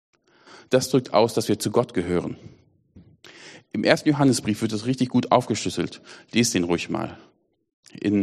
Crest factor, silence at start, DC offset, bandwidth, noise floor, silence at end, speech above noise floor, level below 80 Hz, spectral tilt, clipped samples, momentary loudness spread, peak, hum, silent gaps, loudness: 24 dB; 0.55 s; under 0.1%; 13.5 kHz; -53 dBFS; 0 s; 30 dB; -58 dBFS; -5 dB/octave; under 0.1%; 13 LU; 0 dBFS; none; 7.73-7.83 s; -23 LUFS